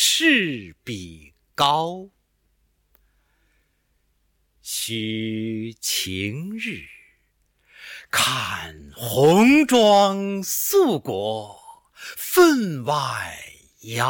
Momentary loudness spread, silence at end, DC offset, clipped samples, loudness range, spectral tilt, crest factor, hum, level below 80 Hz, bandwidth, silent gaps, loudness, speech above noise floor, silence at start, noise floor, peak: 22 LU; 0 s; under 0.1%; under 0.1%; 13 LU; -3.5 dB/octave; 16 dB; none; -58 dBFS; 17.5 kHz; none; -20 LUFS; 47 dB; 0 s; -68 dBFS; -6 dBFS